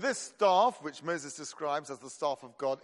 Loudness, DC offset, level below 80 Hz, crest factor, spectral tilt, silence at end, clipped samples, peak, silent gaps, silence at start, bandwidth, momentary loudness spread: -32 LUFS; under 0.1%; -84 dBFS; 18 dB; -3 dB/octave; 0.05 s; under 0.1%; -14 dBFS; none; 0 s; 11.5 kHz; 13 LU